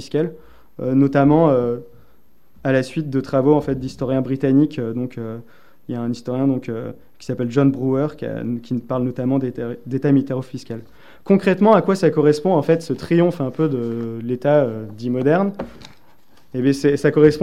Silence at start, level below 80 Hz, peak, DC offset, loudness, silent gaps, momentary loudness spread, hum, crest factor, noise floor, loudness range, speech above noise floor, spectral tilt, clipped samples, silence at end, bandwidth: 0 s; -52 dBFS; 0 dBFS; 0.7%; -19 LUFS; none; 15 LU; none; 18 dB; -58 dBFS; 5 LU; 40 dB; -8 dB/octave; under 0.1%; 0 s; 13.5 kHz